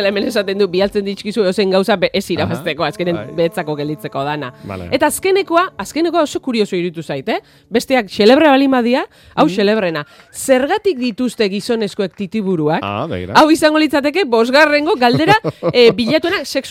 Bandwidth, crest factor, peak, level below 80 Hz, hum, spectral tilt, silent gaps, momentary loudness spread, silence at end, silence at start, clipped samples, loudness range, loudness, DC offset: 16.5 kHz; 14 dB; 0 dBFS; -52 dBFS; none; -5 dB/octave; none; 11 LU; 0 s; 0 s; under 0.1%; 5 LU; -15 LUFS; under 0.1%